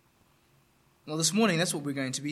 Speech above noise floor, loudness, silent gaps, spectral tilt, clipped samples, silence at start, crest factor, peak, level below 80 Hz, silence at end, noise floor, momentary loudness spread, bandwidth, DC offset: 37 dB; -28 LUFS; none; -3.5 dB/octave; under 0.1%; 1.05 s; 18 dB; -14 dBFS; -74 dBFS; 0 s; -66 dBFS; 8 LU; 15 kHz; under 0.1%